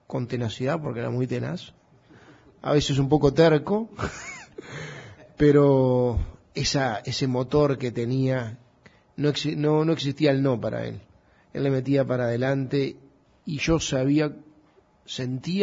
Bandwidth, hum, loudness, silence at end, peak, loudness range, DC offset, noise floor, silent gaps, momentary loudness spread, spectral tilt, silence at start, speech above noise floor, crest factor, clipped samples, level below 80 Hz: 7.8 kHz; none; -24 LUFS; 0 s; -6 dBFS; 4 LU; under 0.1%; -59 dBFS; none; 18 LU; -6 dB/octave; 0.1 s; 35 dB; 18 dB; under 0.1%; -46 dBFS